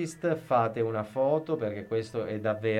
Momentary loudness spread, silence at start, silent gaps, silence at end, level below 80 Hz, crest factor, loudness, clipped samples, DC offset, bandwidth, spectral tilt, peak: 6 LU; 0 s; none; 0 s; -68 dBFS; 16 dB; -30 LUFS; under 0.1%; under 0.1%; 13 kHz; -7 dB/octave; -14 dBFS